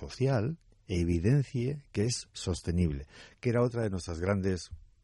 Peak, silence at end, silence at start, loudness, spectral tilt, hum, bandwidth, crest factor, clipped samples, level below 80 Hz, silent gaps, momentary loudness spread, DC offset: -16 dBFS; 0.25 s; 0 s; -32 LUFS; -6.5 dB/octave; none; 11.5 kHz; 16 dB; under 0.1%; -50 dBFS; none; 9 LU; under 0.1%